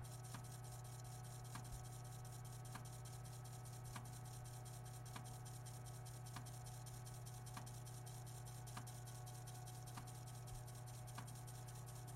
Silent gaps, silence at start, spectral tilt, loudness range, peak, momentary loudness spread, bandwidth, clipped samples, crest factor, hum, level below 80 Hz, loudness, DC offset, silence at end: none; 0 s; -4.5 dB/octave; 0 LU; -36 dBFS; 1 LU; 16 kHz; under 0.1%; 16 dB; none; -66 dBFS; -54 LUFS; under 0.1%; 0 s